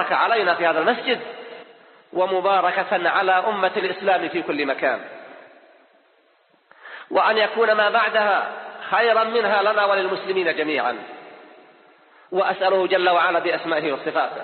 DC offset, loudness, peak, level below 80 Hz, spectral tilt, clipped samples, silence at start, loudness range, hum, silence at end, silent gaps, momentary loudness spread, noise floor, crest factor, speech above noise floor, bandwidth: under 0.1%; -20 LUFS; -4 dBFS; -74 dBFS; -0.5 dB/octave; under 0.1%; 0 s; 5 LU; none; 0 s; none; 13 LU; -60 dBFS; 18 dB; 40 dB; 4.6 kHz